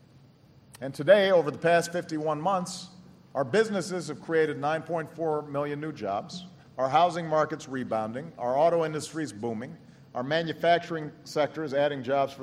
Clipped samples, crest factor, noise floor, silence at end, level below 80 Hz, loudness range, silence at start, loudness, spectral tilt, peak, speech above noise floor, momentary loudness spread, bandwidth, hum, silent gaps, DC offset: under 0.1%; 20 dB; -56 dBFS; 0 s; -70 dBFS; 4 LU; 0.75 s; -28 LUFS; -5 dB/octave; -8 dBFS; 29 dB; 13 LU; 15 kHz; none; none; under 0.1%